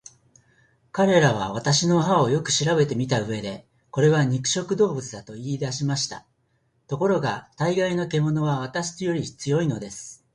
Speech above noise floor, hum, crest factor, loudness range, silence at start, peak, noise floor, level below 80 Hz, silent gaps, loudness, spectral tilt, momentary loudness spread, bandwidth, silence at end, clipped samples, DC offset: 45 dB; none; 18 dB; 5 LU; 0.95 s; -6 dBFS; -68 dBFS; -58 dBFS; none; -23 LUFS; -5 dB/octave; 13 LU; 11 kHz; 0.2 s; under 0.1%; under 0.1%